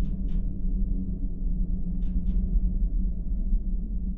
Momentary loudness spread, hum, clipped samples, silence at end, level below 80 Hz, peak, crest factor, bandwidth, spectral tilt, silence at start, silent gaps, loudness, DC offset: 4 LU; none; under 0.1%; 0 s; -26 dBFS; -14 dBFS; 12 dB; 0.8 kHz; -12.5 dB/octave; 0 s; none; -32 LUFS; under 0.1%